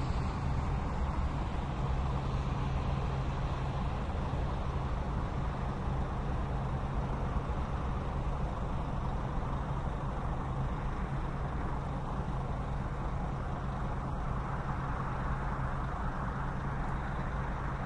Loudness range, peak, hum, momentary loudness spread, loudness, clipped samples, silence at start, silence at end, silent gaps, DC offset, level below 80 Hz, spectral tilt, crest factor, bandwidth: 2 LU; -20 dBFS; none; 2 LU; -36 LUFS; under 0.1%; 0 s; 0 s; none; under 0.1%; -38 dBFS; -7.5 dB/octave; 14 dB; 9.6 kHz